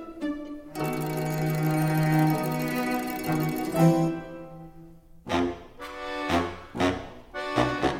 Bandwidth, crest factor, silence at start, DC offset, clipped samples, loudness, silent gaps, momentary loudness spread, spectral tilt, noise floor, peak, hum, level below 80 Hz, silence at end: 17 kHz; 18 dB; 0 s; under 0.1%; under 0.1%; -27 LUFS; none; 17 LU; -6.5 dB/octave; -48 dBFS; -8 dBFS; none; -50 dBFS; 0 s